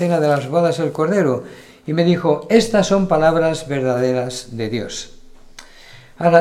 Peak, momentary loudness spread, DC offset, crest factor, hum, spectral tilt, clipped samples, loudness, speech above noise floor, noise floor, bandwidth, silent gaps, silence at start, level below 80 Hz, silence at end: 0 dBFS; 11 LU; under 0.1%; 18 dB; none; -6 dB/octave; under 0.1%; -18 LUFS; 25 dB; -42 dBFS; 14 kHz; none; 0 s; -44 dBFS; 0 s